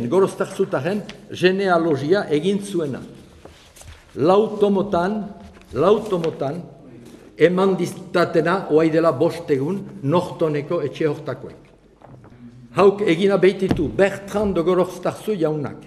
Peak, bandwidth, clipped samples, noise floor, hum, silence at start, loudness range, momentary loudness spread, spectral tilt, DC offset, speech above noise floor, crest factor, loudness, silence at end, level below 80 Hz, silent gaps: -2 dBFS; 13 kHz; under 0.1%; -47 dBFS; none; 0 s; 3 LU; 12 LU; -6.5 dB/octave; under 0.1%; 28 dB; 18 dB; -20 LUFS; 0 s; -50 dBFS; none